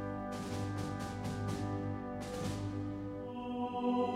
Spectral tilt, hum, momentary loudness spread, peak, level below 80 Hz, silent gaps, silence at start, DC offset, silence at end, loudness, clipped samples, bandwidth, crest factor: -6.5 dB/octave; none; 5 LU; -22 dBFS; -56 dBFS; none; 0 s; under 0.1%; 0 s; -39 LUFS; under 0.1%; 15 kHz; 16 dB